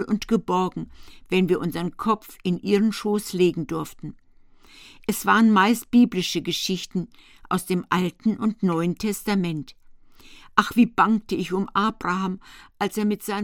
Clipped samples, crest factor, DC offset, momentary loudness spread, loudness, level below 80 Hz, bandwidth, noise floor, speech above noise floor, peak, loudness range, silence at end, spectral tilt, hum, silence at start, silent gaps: under 0.1%; 24 dB; under 0.1%; 12 LU; -23 LUFS; -52 dBFS; 17.5 kHz; -51 dBFS; 28 dB; 0 dBFS; 4 LU; 0 s; -5.5 dB/octave; none; 0 s; none